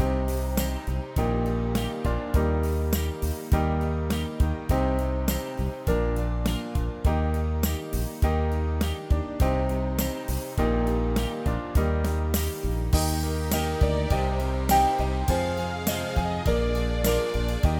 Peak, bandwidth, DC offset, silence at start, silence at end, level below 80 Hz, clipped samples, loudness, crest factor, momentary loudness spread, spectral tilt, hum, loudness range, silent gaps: -8 dBFS; 19.5 kHz; under 0.1%; 0 s; 0 s; -28 dBFS; under 0.1%; -26 LUFS; 16 dB; 5 LU; -6 dB/octave; none; 2 LU; none